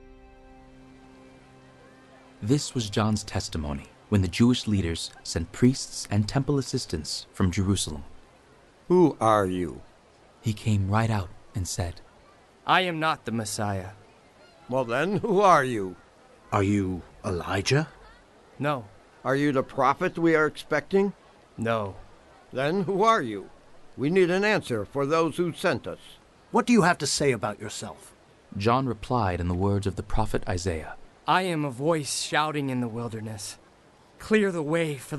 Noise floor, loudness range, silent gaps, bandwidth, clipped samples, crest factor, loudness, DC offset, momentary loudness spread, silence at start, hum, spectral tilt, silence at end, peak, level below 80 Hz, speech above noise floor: -56 dBFS; 4 LU; none; 12 kHz; under 0.1%; 20 dB; -26 LUFS; under 0.1%; 13 LU; 0.1 s; none; -5.5 dB/octave; 0 s; -6 dBFS; -46 dBFS; 31 dB